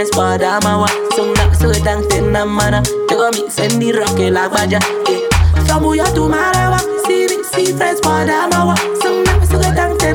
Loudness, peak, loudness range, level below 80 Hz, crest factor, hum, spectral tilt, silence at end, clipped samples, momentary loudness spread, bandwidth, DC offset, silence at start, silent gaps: -13 LUFS; -2 dBFS; 1 LU; -22 dBFS; 10 dB; none; -4.5 dB/octave; 0 s; under 0.1%; 3 LU; 18.5 kHz; under 0.1%; 0 s; none